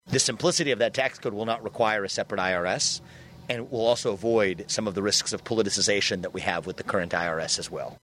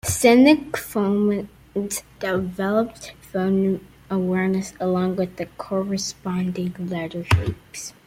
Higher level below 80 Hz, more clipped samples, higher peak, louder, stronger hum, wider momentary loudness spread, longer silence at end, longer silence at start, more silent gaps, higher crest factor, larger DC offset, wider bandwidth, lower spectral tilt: second, -60 dBFS vs -46 dBFS; neither; second, -6 dBFS vs -2 dBFS; second, -26 LUFS vs -22 LUFS; neither; second, 8 LU vs 14 LU; about the same, 0.05 s vs 0.15 s; about the same, 0.05 s vs 0.05 s; neither; about the same, 20 dB vs 20 dB; neither; about the same, 16 kHz vs 16.5 kHz; second, -2.5 dB/octave vs -5.5 dB/octave